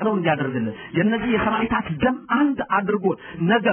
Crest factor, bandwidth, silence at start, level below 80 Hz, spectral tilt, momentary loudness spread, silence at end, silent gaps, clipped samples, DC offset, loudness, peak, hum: 16 dB; 3.5 kHz; 0 s; -48 dBFS; -3 dB/octave; 5 LU; 0 s; none; under 0.1%; under 0.1%; -22 LUFS; -6 dBFS; none